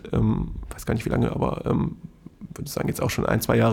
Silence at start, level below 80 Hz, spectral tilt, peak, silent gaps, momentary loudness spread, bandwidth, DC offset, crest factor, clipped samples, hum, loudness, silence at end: 0.05 s; -38 dBFS; -6.5 dB/octave; -6 dBFS; none; 17 LU; 19 kHz; under 0.1%; 18 dB; under 0.1%; none; -25 LUFS; 0 s